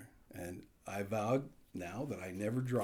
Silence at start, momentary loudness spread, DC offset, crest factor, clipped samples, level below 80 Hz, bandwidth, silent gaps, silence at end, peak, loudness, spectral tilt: 0 s; 14 LU; under 0.1%; 16 dB; under 0.1%; -68 dBFS; 18.5 kHz; none; 0 s; -22 dBFS; -40 LUFS; -7 dB/octave